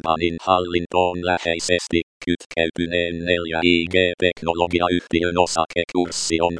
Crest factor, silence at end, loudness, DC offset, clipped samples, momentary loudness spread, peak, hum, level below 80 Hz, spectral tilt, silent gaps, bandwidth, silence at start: 20 dB; 0 s; -20 LUFS; under 0.1%; under 0.1%; 5 LU; 0 dBFS; none; -46 dBFS; -4 dB/octave; 2.03-2.21 s, 2.46-2.50 s; 10.5 kHz; 0.05 s